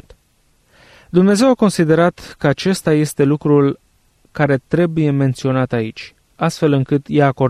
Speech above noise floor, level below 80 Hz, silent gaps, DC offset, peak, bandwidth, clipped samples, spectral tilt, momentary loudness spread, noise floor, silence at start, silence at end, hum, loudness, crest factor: 43 dB; -50 dBFS; none; under 0.1%; -2 dBFS; 14.5 kHz; under 0.1%; -6.5 dB/octave; 8 LU; -58 dBFS; 1.15 s; 0 s; none; -16 LUFS; 14 dB